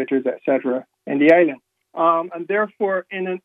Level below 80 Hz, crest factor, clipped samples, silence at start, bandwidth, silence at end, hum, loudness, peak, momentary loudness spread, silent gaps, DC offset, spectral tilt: -74 dBFS; 18 dB; under 0.1%; 0 s; 6.4 kHz; 0.05 s; none; -19 LUFS; -2 dBFS; 12 LU; none; under 0.1%; -8 dB/octave